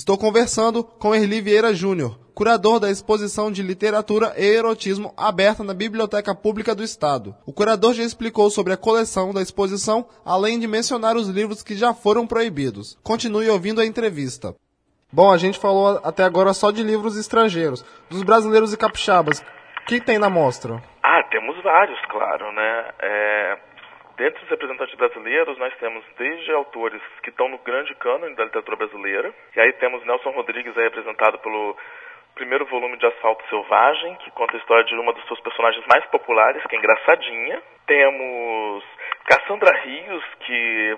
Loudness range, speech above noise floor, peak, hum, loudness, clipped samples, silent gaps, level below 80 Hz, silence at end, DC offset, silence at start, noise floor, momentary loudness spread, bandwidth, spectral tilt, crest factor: 5 LU; 45 dB; 0 dBFS; none; -20 LUFS; under 0.1%; none; -58 dBFS; 0 s; under 0.1%; 0 s; -65 dBFS; 11 LU; 10.5 kHz; -4 dB/octave; 20 dB